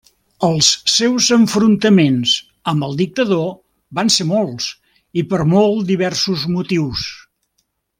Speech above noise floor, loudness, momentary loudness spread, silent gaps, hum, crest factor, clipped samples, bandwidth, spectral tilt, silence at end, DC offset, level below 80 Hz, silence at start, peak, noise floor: 53 dB; -15 LUFS; 11 LU; none; none; 16 dB; under 0.1%; 16 kHz; -4 dB/octave; 0.85 s; under 0.1%; -50 dBFS; 0.4 s; 0 dBFS; -68 dBFS